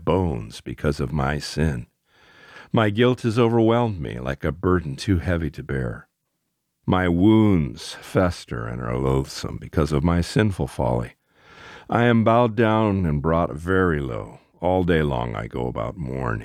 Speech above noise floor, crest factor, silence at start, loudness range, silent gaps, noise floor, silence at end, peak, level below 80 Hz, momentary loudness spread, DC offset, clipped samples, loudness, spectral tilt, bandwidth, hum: 54 dB; 18 dB; 0 s; 3 LU; none; -76 dBFS; 0 s; -4 dBFS; -38 dBFS; 13 LU; under 0.1%; under 0.1%; -22 LUFS; -7 dB/octave; 14.5 kHz; none